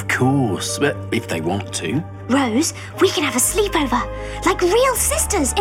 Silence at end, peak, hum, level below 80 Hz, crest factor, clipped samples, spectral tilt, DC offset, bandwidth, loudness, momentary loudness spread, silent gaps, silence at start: 0 s; -4 dBFS; none; -34 dBFS; 16 dB; under 0.1%; -3.5 dB/octave; under 0.1%; 18 kHz; -19 LUFS; 7 LU; none; 0 s